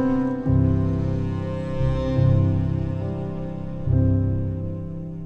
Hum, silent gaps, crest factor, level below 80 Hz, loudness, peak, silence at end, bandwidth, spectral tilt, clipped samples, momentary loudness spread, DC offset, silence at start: none; none; 14 dB; -34 dBFS; -23 LUFS; -8 dBFS; 0 s; 5.2 kHz; -10.5 dB/octave; under 0.1%; 10 LU; under 0.1%; 0 s